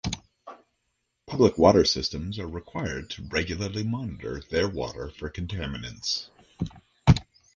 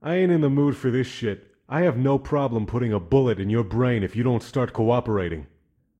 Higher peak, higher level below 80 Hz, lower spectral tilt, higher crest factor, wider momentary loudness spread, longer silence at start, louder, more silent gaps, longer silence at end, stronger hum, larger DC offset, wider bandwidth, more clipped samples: about the same, -4 dBFS vs -6 dBFS; about the same, -42 dBFS vs -46 dBFS; second, -5.5 dB/octave vs -8.5 dB/octave; first, 22 dB vs 16 dB; first, 17 LU vs 9 LU; about the same, 0.05 s vs 0 s; second, -27 LUFS vs -23 LUFS; neither; second, 0.35 s vs 0.55 s; neither; neither; about the same, 10 kHz vs 9.6 kHz; neither